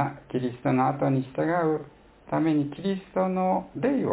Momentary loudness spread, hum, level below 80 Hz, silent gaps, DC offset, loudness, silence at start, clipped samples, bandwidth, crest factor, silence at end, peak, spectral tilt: 7 LU; none; -60 dBFS; none; under 0.1%; -27 LUFS; 0 s; under 0.1%; 4 kHz; 16 dB; 0 s; -10 dBFS; -12 dB/octave